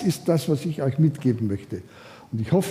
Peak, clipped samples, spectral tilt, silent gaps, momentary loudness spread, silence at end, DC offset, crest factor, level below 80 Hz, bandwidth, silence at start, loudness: -8 dBFS; under 0.1%; -7.5 dB/octave; none; 14 LU; 0 s; under 0.1%; 16 dB; -58 dBFS; 15.5 kHz; 0 s; -24 LUFS